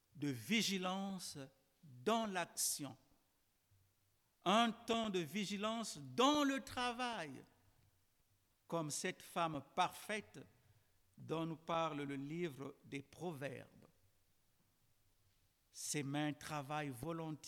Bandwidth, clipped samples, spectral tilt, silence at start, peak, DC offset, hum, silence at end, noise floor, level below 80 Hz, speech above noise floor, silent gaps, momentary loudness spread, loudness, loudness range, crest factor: 19 kHz; under 0.1%; -3.5 dB/octave; 0.15 s; -22 dBFS; under 0.1%; none; 0 s; -80 dBFS; -78 dBFS; 38 dB; none; 15 LU; -41 LUFS; 9 LU; 22 dB